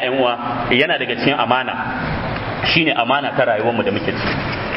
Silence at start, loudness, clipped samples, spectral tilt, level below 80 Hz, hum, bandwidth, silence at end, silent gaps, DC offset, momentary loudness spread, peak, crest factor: 0 s; -18 LUFS; under 0.1%; -8 dB/octave; -40 dBFS; none; 6 kHz; 0 s; none; under 0.1%; 7 LU; 0 dBFS; 18 dB